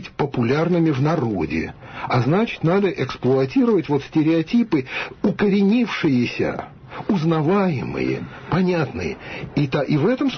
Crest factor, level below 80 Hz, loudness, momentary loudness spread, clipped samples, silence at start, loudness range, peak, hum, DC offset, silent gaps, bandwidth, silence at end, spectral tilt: 12 dB; -48 dBFS; -20 LUFS; 9 LU; under 0.1%; 0 s; 2 LU; -8 dBFS; none; under 0.1%; none; 6.6 kHz; 0 s; -8 dB/octave